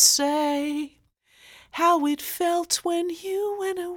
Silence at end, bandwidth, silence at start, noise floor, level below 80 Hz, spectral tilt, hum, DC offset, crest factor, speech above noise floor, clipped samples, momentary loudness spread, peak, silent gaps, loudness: 0 s; over 20 kHz; 0 s; -58 dBFS; -66 dBFS; 0 dB/octave; none; under 0.1%; 22 dB; 34 dB; under 0.1%; 9 LU; -4 dBFS; none; -24 LUFS